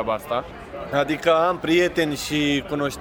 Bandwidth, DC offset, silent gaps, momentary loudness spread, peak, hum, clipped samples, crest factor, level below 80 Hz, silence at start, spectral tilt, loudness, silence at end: 18.5 kHz; under 0.1%; none; 9 LU; -6 dBFS; none; under 0.1%; 16 dB; -48 dBFS; 0 s; -4.5 dB/octave; -22 LUFS; 0 s